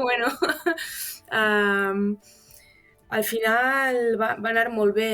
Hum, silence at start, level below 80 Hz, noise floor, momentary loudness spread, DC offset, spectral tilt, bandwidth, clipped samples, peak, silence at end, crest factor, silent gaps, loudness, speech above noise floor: none; 0 s; -62 dBFS; -56 dBFS; 9 LU; under 0.1%; -4 dB/octave; over 20 kHz; under 0.1%; -8 dBFS; 0 s; 16 dB; none; -23 LUFS; 33 dB